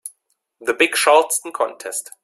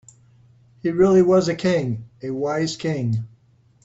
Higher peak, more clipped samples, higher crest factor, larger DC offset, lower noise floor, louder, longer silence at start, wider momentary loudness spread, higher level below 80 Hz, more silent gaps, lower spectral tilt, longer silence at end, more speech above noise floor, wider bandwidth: first, -2 dBFS vs -6 dBFS; neither; about the same, 18 dB vs 16 dB; neither; first, -62 dBFS vs -57 dBFS; first, -18 LUFS vs -21 LUFS; second, 0.05 s vs 0.85 s; about the same, 13 LU vs 14 LU; second, -68 dBFS vs -54 dBFS; neither; second, 0 dB/octave vs -6.5 dB/octave; second, 0.2 s vs 0.6 s; first, 43 dB vs 37 dB; first, 16 kHz vs 8 kHz